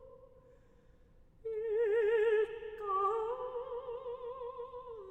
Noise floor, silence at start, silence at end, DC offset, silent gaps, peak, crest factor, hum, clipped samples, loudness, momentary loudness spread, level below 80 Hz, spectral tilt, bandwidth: -62 dBFS; 0 s; 0 s; under 0.1%; none; -22 dBFS; 14 dB; none; under 0.1%; -35 LUFS; 15 LU; -66 dBFS; -5.5 dB/octave; 8 kHz